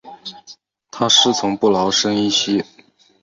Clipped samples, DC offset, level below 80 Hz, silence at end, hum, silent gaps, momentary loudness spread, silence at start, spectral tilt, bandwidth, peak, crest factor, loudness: under 0.1%; under 0.1%; -58 dBFS; 0.6 s; none; none; 22 LU; 0.05 s; -3 dB/octave; 7.8 kHz; 0 dBFS; 18 dB; -16 LUFS